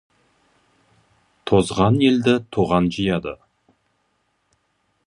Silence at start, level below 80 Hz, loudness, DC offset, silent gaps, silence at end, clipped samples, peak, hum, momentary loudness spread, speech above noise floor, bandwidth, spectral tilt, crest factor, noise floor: 1.45 s; -46 dBFS; -19 LUFS; under 0.1%; none; 1.75 s; under 0.1%; -2 dBFS; none; 16 LU; 50 dB; 11.5 kHz; -6.5 dB/octave; 20 dB; -68 dBFS